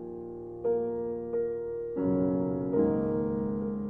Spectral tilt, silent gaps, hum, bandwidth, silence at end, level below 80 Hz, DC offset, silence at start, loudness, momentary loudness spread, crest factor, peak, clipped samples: -13 dB/octave; none; none; 2.5 kHz; 0 s; -54 dBFS; under 0.1%; 0 s; -30 LUFS; 7 LU; 16 dB; -14 dBFS; under 0.1%